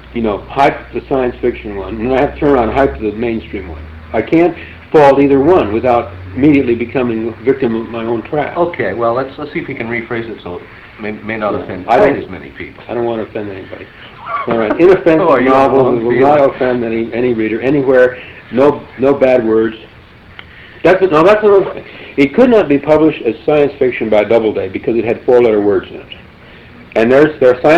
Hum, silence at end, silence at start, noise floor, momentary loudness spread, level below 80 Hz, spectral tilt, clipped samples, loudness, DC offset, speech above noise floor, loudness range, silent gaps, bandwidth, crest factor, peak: none; 0 s; 0.05 s; -37 dBFS; 16 LU; -38 dBFS; -8 dB/octave; under 0.1%; -12 LUFS; under 0.1%; 25 dB; 6 LU; none; 8 kHz; 12 dB; 0 dBFS